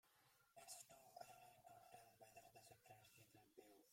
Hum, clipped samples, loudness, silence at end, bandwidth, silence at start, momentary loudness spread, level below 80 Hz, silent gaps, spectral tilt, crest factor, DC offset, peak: none; under 0.1%; -65 LUFS; 0 s; 16.5 kHz; 0.05 s; 9 LU; under -90 dBFS; none; -2 dB/octave; 24 dB; under 0.1%; -44 dBFS